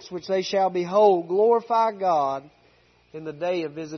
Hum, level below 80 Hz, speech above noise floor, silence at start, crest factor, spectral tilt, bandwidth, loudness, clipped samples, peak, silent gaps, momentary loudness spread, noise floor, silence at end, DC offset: none; -70 dBFS; 37 dB; 0.05 s; 16 dB; -5.5 dB/octave; 6.4 kHz; -22 LUFS; under 0.1%; -6 dBFS; none; 15 LU; -59 dBFS; 0 s; under 0.1%